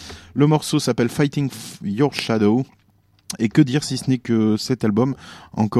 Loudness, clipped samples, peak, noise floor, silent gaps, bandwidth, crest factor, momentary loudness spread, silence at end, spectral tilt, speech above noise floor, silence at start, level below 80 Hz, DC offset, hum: -20 LUFS; under 0.1%; -2 dBFS; -58 dBFS; none; 14 kHz; 18 dB; 12 LU; 0 s; -6 dB/octave; 39 dB; 0 s; -54 dBFS; under 0.1%; none